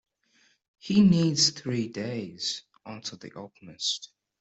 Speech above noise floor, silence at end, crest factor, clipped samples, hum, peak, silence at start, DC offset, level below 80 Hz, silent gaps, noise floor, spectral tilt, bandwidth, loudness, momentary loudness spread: 39 dB; 0.35 s; 18 dB; under 0.1%; none; -10 dBFS; 0.85 s; under 0.1%; -62 dBFS; none; -66 dBFS; -4.5 dB/octave; 8.2 kHz; -26 LUFS; 23 LU